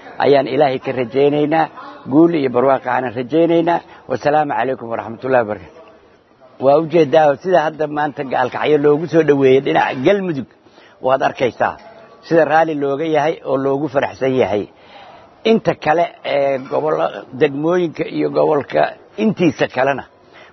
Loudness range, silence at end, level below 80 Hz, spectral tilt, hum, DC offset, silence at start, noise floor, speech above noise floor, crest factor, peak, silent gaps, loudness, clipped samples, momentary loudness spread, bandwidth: 3 LU; 0.5 s; -60 dBFS; -7 dB/octave; none; under 0.1%; 0 s; -48 dBFS; 33 dB; 16 dB; 0 dBFS; none; -16 LUFS; under 0.1%; 8 LU; 6.2 kHz